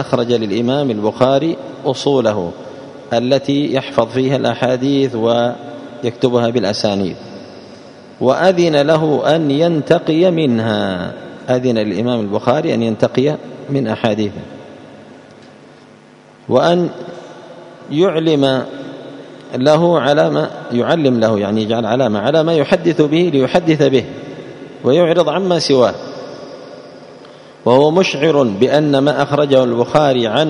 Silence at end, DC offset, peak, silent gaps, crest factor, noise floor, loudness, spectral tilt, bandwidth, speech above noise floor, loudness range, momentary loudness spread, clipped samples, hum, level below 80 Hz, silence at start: 0 s; under 0.1%; 0 dBFS; none; 14 dB; -43 dBFS; -14 LUFS; -6.5 dB/octave; 10.5 kHz; 29 dB; 5 LU; 19 LU; under 0.1%; none; -56 dBFS; 0 s